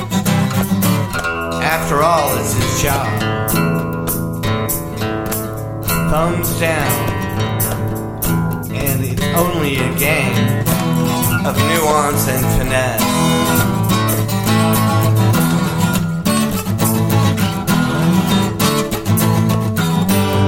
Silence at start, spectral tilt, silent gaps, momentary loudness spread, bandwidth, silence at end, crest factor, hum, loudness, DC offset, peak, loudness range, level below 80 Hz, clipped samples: 0 s; -5 dB/octave; none; 6 LU; 17 kHz; 0 s; 14 dB; none; -16 LUFS; under 0.1%; 0 dBFS; 3 LU; -32 dBFS; under 0.1%